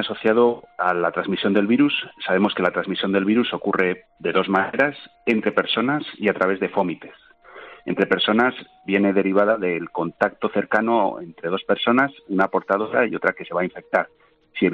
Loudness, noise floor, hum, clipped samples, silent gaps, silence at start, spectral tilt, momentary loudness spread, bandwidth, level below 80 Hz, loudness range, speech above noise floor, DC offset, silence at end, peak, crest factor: -21 LUFS; -43 dBFS; none; under 0.1%; none; 0 s; -7.5 dB/octave; 8 LU; 6.6 kHz; -66 dBFS; 2 LU; 22 dB; under 0.1%; 0 s; -4 dBFS; 16 dB